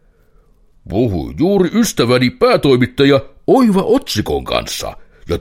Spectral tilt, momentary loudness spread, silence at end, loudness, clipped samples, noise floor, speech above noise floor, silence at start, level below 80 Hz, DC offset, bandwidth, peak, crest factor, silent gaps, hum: -5.5 dB/octave; 10 LU; 0 s; -14 LUFS; under 0.1%; -50 dBFS; 37 dB; 0.85 s; -36 dBFS; under 0.1%; 16.5 kHz; 0 dBFS; 14 dB; none; none